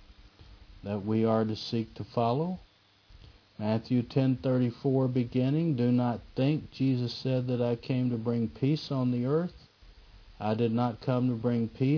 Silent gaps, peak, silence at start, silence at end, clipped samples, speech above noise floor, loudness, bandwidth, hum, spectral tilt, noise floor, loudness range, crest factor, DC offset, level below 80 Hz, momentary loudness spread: none; -12 dBFS; 0.1 s; 0 s; under 0.1%; 30 dB; -30 LUFS; 5.4 kHz; none; -9 dB/octave; -58 dBFS; 3 LU; 16 dB; under 0.1%; -58 dBFS; 7 LU